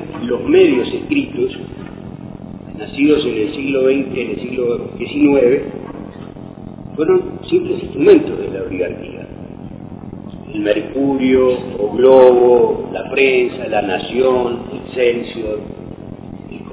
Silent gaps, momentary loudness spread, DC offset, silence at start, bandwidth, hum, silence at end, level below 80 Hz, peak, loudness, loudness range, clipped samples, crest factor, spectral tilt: none; 21 LU; under 0.1%; 0 s; 4 kHz; none; 0 s; -44 dBFS; 0 dBFS; -15 LUFS; 6 LU; 0.1%; 16 dB; -10.5 dB/octave